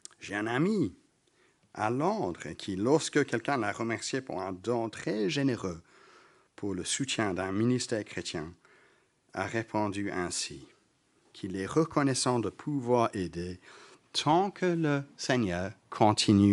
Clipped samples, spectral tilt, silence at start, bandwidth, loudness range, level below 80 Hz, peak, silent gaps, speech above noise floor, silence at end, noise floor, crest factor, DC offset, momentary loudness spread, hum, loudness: under 0.1%; -5 dB/octave; 0.2 s; 11.5 kHz; 4 LU; -66 dBFS; -8 dBFS; none; 39 dB; 0 s; -69 dBFS; 22 dB; under 0.1%; 12 LU; none; -31 LUFS